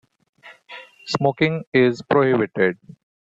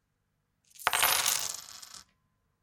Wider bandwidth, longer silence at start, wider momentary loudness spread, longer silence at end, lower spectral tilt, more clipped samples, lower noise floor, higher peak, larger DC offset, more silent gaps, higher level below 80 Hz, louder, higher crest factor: second, 7.8 kHz vs 17 kHz; second, 0.45 s vs 0.8 s; about the same, 21 LU vs 21 LU; about the same, 0.5 s vs 0.6 s; first, -6.5 dB/octave vs 1.5 dB/octave; neither; second, -42 dBFS vs -78 dBFS; about the same, -4 dBFS vs -4 dBFS; neither; first, 1.67-1.72 s vs none; first, -60 dBFS vs -70 dBFS; first, -20 LUFS vs -27 LUFS; second, 18 dB vs 30 dB